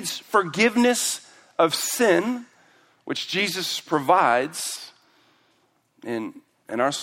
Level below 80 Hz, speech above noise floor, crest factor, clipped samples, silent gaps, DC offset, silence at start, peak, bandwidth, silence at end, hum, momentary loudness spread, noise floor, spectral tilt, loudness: -72 dBFS; 43 dB; 20 dB; under 0.1%; none; under 0.1%; 0 s; -4 dBFS; 16.5 kHz; 0 s; none; 15 LU; -66 dBFS; -2.5 dB/octave; -23 LUFS